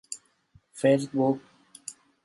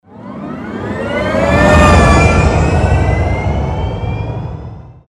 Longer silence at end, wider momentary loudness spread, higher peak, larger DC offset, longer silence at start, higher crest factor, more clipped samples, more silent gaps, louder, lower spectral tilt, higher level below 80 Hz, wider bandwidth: first, 0.35 s vs 0.15 s; about the same, 19 LU vs 18 LU; second, -10 dBFS vs 0 dBFS; neither; about the same, 0.1 s vs 0.1 s; first, 20 dB vs 12 dB; second, under 0.1% vs 0.2%; neither; second, -26 LUFS vs -12 LUFS; about the same, -6 dB/octave vs -6.5 dB/octave; second, -74 dBFS vs -20 dBFS; about the same, 11.5 kHz vs 11.5 kHz